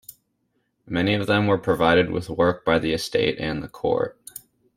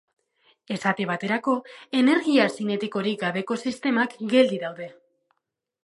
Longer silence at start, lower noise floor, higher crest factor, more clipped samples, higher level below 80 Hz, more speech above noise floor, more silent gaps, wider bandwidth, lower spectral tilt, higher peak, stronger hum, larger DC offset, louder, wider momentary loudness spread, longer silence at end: second, 0.1 s vs 0.7 s; second, -72 dBFS vs -81 dBFS; about the same, 20 dB vs 20 dB; neither; first, -50 dBFS vs -76 dBFS; second, 50 dB vs 57 dB; neither; first, 16 kHz vs 11.5 kHz; about the same, -5.5 dB/octave vs -5.5 dB/octave; about the same, -4 dBFS vs -4 dBFS; neither; neither; about the same, -22 LUFS vs -24 LUFS; about the same, 11 LU vs 10 LU; second, 0.4 s vs 0.95 s